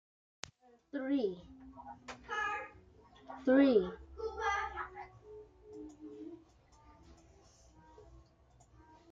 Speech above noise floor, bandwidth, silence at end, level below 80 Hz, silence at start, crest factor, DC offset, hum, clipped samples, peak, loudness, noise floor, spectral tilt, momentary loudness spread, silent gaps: 35 dB; 7.8 kHz; 0.9 s; -62 dBFS; 0.95 s; 22 dB; under 0.1%; none; under 0.1%; -16 dBFS; -35 LUFS; -65 dBFS; -5.5 dB/octave; 24 LU; none